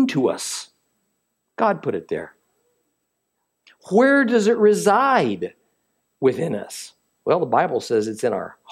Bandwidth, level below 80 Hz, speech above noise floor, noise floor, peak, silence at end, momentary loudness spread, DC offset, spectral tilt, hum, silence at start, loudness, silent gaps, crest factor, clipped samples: 14.5 kHz; -72 dBFS; 56 dB; -75 dBFS; -4 dBFS; 0.2 s; 15 LU; under 0.1%; -5 dB/octave; none; 0 s; -20 LUFS; none; 18 dB; under 0.1%